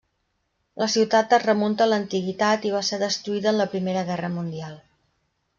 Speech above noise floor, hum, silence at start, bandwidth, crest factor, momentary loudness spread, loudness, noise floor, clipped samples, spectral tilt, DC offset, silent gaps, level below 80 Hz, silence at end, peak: 51 dB; none; 0.75 s; 7.6 kHz; 18 dB; 10 LU; -23 LUFS; -73 dBFS; under 0.1%; -4.5 dB/octave; under 0.1%; none; -66 dBFS; 0.8 s; -6 dBFS